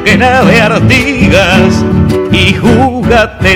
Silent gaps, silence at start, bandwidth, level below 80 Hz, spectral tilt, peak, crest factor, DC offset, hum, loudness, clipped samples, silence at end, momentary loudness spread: none; 0 s; 18 kHz; -22 dBFS; -5.5 dB/octave; 0 dBFS; 6 dB; under 0.1%; none; -7 LUFS; 6%; 0 s; 3 LU